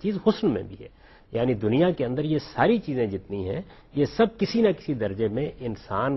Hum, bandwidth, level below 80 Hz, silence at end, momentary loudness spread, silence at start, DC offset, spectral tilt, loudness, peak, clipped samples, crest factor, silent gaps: none; 6 kHz; -52 dBFS; 0 s; 11 LU; 0 s; under 0.1%; -8 dB/octave; -26 LUFS; -6 dBFS; under 0.1%; 20 dB; none